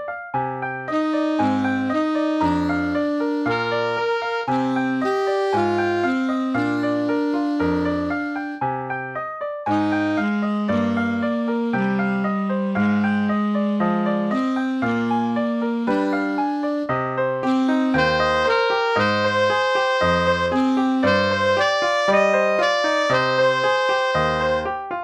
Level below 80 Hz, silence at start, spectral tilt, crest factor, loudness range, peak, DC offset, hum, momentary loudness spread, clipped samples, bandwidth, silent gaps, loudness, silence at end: -50 dBFS; 0 s; -6 dB/octave; 14 dB; 4 LU; -6 dBFS; under 0.1%; none; 5 LU; under 0.1%; 10 kHz; none; -21 LUFS; 0 s